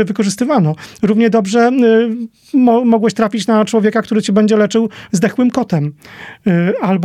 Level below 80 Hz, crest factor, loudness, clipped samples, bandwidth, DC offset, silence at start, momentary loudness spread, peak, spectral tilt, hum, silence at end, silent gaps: -58 dBFS; 12 dB; -13 LUFS; under 0.1%; 13.5 kHz; under 0.1%; 0 s; 8 LU; -2 dBFS; -6.5 dB/octave; none; 0 s; none